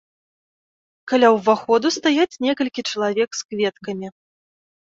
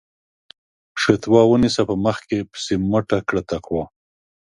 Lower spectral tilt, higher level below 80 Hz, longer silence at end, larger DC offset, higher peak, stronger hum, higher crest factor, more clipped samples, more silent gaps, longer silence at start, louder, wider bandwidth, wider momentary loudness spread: second, -3.5 dB/octave vs -6 dB/octave; second, -68 dBFS vs -46 dBFS; first, 0.75 s vs 0.55 s; neither; second, -4 dBFS vs 0 dBFS; neither; about the same, 18 dB vs 20 dB; neither; first, 3.45-3.49 s vs none; about the same, 1.05 s vs 0.95 s; about the same, -19 LUFS vs -19 LUFS; second, 7.8 kHz vs 11.5 kHz; about the same, 14 LU vs 12 LU